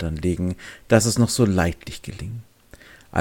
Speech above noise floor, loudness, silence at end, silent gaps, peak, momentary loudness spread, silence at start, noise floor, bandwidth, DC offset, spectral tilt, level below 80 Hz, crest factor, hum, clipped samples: 26 dB; -21 LUFS; 0 s; none; 0 dBFS; 17 LU; 0 s; -48 dBFS; 17 kHz; under 0.1%; -5 dB/octave; -40 dBFS; 22 dB; none; under 0.1%